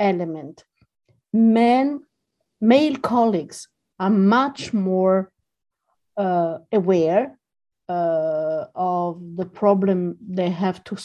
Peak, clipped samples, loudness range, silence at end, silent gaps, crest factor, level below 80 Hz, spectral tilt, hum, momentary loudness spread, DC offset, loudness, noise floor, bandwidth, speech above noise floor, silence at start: -4 dBFS; under 0.1%; 3 LU; 0 s; none; 16 dB; -66 dBFS; -7 dB/octave; none; 14 LU; under 0.1%; -21 LUFS; -76 dBFS; 11.5 kHz; 56 dB; 0 s